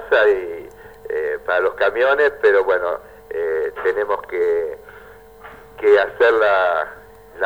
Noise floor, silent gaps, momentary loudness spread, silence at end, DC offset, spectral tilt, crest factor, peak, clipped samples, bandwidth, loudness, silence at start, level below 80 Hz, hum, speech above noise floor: -42 dBFS; none; 15 LU; 0 s; 0.1%; -4.5 dB/octave; 16 dB; -2 dBFS; under 0.1%; 15 kHz; -18 LUFS; 0 s; -52 dBFS; none; 26 dB